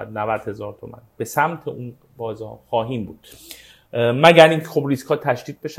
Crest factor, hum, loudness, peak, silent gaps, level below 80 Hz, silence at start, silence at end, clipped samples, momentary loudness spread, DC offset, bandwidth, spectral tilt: 20 dB; none; -18 LUFS; 0 dBFS; none; -58 dBFS; 0 s; 0.05 s; under 0.1%; 23 LU; under 0.1%; 16 kHz; -5.5 dB/octave